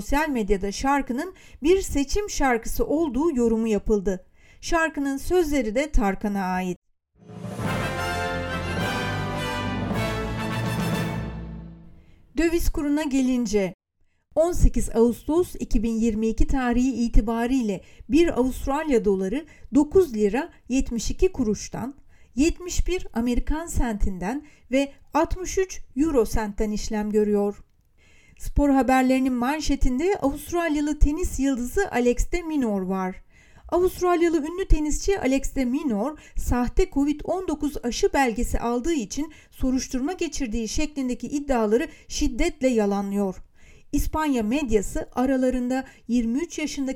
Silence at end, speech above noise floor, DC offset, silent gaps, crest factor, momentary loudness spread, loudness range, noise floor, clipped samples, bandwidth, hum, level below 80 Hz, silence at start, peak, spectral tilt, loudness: 0 s; 43 dB; under 0.1%; 6.76-6.82 s, 13.74-13.79 s; 20 dB; 8 LU; 4 LU; -66 dBFS; under 0.1%; 17.5 kHz; none; -32 dBFS; 0 s; -4 dBFS; -5.5 dB/octave; -25 LUFS